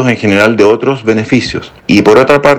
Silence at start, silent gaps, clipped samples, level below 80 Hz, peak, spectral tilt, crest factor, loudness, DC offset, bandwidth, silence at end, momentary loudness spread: 0 s; none; 5%; -40 dBFS; 0 dBFS; -6 dB/octave; 8 dB; -9 LUFS; under 0.1%; 14.5 kHz; 0 s; 7 LU